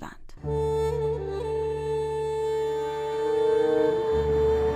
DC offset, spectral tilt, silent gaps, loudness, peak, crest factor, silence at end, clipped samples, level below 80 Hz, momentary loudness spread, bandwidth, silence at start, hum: under 0.1%; -7 dB/octave; none; -26 LUFS; -14 dBFS; 12 dB; 0 s; under 0.1%; -40 dBFS; 7 LU; 9.6 kHz; 0 s; none